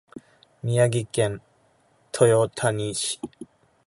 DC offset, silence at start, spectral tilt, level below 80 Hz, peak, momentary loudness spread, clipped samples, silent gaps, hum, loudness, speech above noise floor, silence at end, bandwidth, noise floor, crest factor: under 0.1%; 0.15 s; -5 dB/octave; -60 dBFS; -4 dBFS; 16 LU; under 0.1%; none; none; -23 LUFS; 40 dB; 0.45 s; 11.5 kHz; -62 dBFS; 22 dB